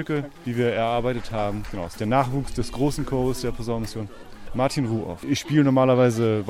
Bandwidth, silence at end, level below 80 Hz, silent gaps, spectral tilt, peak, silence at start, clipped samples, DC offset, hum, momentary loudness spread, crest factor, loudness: 16 kHz; 0 s; -40 dBFS; none; -6.5 dB/octave; -6 dBFS; 0 s; under 0.1%; under 0.1%; none; 12 LU; 16 dB; -24 LUFS